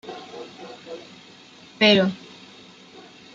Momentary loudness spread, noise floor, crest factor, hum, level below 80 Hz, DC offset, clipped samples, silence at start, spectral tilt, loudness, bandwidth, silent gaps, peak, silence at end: 28 LU; -48 dBFS; 24 dB; none; -68 dBFS; under 0.1%; under 0.1%; 0.05 s; -5 dB/octave; -18 LUFS; 7.6 kHz; none; -4 dBFS; 1.2 s